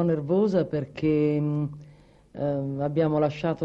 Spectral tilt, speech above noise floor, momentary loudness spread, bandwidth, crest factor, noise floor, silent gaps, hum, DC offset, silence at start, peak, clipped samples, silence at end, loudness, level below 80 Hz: -9.5 dB/octave; 27 dB; 9 LU; 7.2 kHz; 14 dB; -51 dBFS; none; none; under 0.1%; 0 s; -10 dBFS; under 0.1%; 0 s; -26 LUFS; -56 dBFS